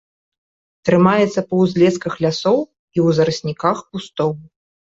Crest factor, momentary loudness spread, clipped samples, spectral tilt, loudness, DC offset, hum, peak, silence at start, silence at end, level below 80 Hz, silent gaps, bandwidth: 16 dB; 10 LU; under 0.1%; -6.5 dB/octave; -17 LUFS; under 0.1%; none; -2 dBFS; 0.85 s; 0.5 s; -54 dBFS; 2.79-2.88 s; 7.8 kHz